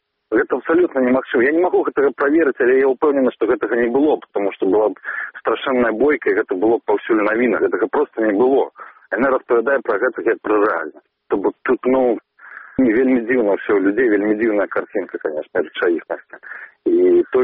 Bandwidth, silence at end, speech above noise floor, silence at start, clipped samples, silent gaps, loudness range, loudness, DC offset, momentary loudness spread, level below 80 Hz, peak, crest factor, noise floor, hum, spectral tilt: 3.8 kHz; 0 s; 23 dB; 0.3 s; under 0.1%; none; 3 LU; -18 LUFS; under 0.1%; 9 LU; -58 dBFS; -4 dBFS; 12 dB; -39 dBFS; none; -4 dB/octave